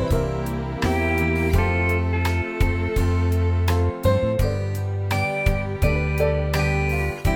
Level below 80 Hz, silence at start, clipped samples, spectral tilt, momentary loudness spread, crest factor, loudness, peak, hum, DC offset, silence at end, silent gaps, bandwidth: -28 dBFS; 0 s; under 0.1%; -7 dB/octave; 4 LU; 16 dB; -22 LUFS; -6 dBFS; none; under 0.1%; 0 s; none; 18 kHz